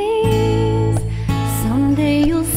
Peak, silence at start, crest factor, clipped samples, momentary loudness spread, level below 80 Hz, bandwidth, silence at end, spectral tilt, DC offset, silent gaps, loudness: -4 dBFS; 0 s; 12 dB; under 0.1%; 5 LU; -28 dBFS; 16 kHz; 0 s; -6.5 dB/octave; under 0.1%; none; -17 LUFS